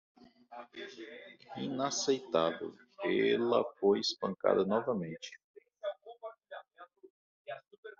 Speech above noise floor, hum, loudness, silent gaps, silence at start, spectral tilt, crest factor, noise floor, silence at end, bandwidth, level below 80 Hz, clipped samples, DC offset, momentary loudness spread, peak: 24 dB; none; -33 LUFS; 5.44-5.54 s, 7.10-7.45 s, 7.78-7.83 s; 0.5 s; -3.5 dB/octave; 20 dB; -57 dBFS; 0.1 s; 7.6 kHz; -80 dBFS; under 0.1%; under 0.1%; 20 LU; -14 dBFS